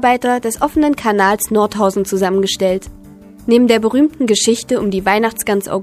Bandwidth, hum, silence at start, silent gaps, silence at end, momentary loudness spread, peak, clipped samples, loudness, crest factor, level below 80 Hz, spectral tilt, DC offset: 15.5 kHz; none; 0 s; none; 0 s; 5 LU; 0 dBFS; under 0.1%; -15 LUFS; 14 dB; -44 dBFS; -4 dB/octave; under 0.1%